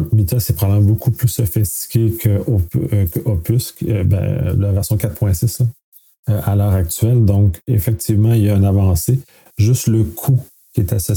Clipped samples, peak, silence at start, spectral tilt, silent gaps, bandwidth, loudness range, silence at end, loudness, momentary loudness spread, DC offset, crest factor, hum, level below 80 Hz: under 0.1%; -4 dBFS; 0 s; -7 dB/octave; 5.83-5.92 s, 6.19-6.23 s; 19.5 kHz; 3 LU; 0 s; -16 LUFS; 6 LU; under 0.1%; 12 dB; none; -34 dBFS